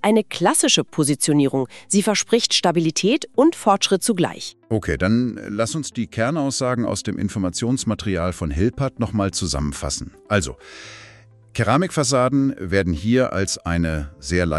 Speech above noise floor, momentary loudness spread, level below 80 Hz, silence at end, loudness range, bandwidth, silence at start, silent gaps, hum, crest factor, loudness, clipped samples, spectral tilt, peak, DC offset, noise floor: 27 dB; 8 LU; -38 dBFS; 0 s; 5 LU; 13.5 kHz; 0.05 s; none; none; 18 dB; -20 LUFS; under 0.1%; -4.5 dB/octave; -2 dBFS; under 0.1%; -48 dBFS